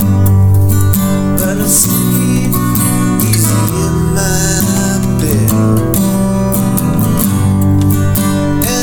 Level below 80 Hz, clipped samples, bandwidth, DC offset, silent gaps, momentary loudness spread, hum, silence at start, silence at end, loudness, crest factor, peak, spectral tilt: -26 dBFS; under 0.1%; over 20 kHz; under 0.1%; none; 3 LU; none; 0 s; 0 s; -11 LUFS; 10 dB; 0 dBFS; -5.5 dB/octave